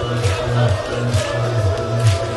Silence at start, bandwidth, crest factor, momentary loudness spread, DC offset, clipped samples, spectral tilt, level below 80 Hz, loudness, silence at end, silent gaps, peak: 0 s; 12 kHz; 14 dB; 2 LU; under 0.1%; under 0.1%; -5.5 dB/octave; -36 dBFS; -19 LUFS; 0 s; none; -2 dBFS